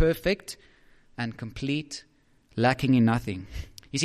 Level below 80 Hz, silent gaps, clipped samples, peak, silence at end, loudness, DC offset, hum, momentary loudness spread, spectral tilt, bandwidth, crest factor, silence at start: -46 dBFS; none; under 0.1%; -8 dBFS; 0 s; -27 LUFS; under 0.1%; none; 19 LU; -5.5 dB/octave; 14.5 kHz; 18 dB; 0 s